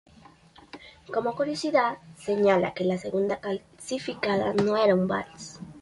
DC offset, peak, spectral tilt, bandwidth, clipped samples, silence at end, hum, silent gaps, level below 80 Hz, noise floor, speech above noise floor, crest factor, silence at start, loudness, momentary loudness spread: under 0.1%; -8 dBFS; -5.5 dB/octave; 11.5 kHz; under 0.1%; 0 s; none; none; -62 dBFS; -54 dBFS; 28 dB; 18 dB; 0.75 s; -26 LUFS; 18 LU